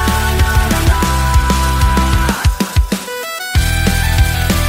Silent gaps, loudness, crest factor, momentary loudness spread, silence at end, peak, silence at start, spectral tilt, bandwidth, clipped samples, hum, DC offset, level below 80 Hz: none; -14 LUFS; 12 dB; 4 LU; 0 s; 0 dBFS; 0 s; -4.5 dB/octave; 16.5 kHz; under 0.1%; none; under 0.1%; -16 dBFS